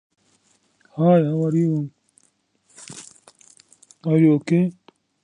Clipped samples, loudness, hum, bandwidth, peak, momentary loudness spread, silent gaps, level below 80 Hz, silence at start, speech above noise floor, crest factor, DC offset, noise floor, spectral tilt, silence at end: under 0.1%; -20 LUFS; none; 10.5 kHz; -4 dBFS; 22 LU; none; -68 dBFS; 0.95 s; 47 dB; 18 dB; under 0.1%; -65 dBFS; -8.5 dB/octave; 0.5 s